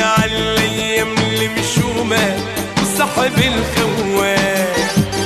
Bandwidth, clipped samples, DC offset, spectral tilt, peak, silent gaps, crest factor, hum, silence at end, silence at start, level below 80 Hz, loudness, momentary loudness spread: 14 kHz; under 0.1%; under 0.1%; -4 dB/octave; -2 dBFS; none; 12 dB; none; 0 s; 0 s; -36 dBFS; -16 LUFS; 3 LU